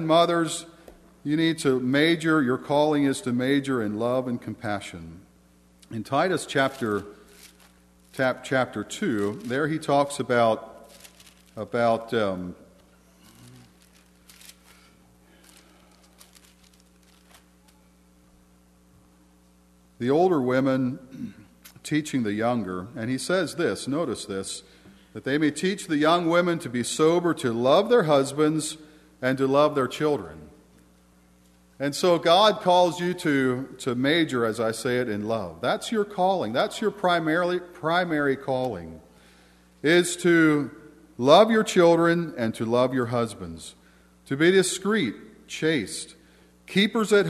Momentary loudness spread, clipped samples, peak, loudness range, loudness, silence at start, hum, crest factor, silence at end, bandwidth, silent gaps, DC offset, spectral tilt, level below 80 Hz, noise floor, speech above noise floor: 15 LU; under 0.1%; -2 dBFS; 7 LU; -24 LUFS; 0 s; 60 Hz at -60 dBFS; 22 dB; 0 s; 13.5 kHz; none; under 0.1%; -5 dB/octave; -62 dBFS; -58 dBFS; 34 dB